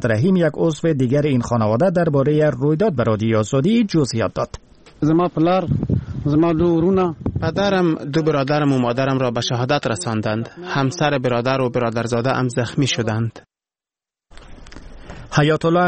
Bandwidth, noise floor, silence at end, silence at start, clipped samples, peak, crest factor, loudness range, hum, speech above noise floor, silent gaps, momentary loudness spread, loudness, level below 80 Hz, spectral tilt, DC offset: 8.8 kHz; under -90 dBFS; 0 s; 0 s; under 0.1%; -4 dBFS; 14 dB; 5 LU; none; over 72 dB; none; 6 LU; -19 LUFS; -44 dBFS; -6.5 dB/octave; under 0.1%